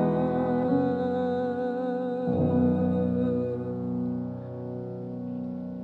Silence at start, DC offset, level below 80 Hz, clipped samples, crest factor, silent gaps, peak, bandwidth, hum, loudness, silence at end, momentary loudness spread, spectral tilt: 0 s; under 0.1%; -62 dBFS; under 0.1%; 14 dB; none; -12 dBFS; 4.5 kHz; none; -28 LUFS; 0 s; 11 LU; -11 dB/octave